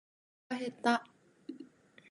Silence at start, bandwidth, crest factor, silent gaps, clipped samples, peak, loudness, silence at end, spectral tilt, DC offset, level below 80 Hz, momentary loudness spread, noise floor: 0.5 s; 11.5 kHz; 24 dB; none; under 0.1%; -16 dBFS; -35 LUFS; 0.45 s; -4 dB/octave; under 0.1%; -88 dBFS; 21 LU; -56 dBFS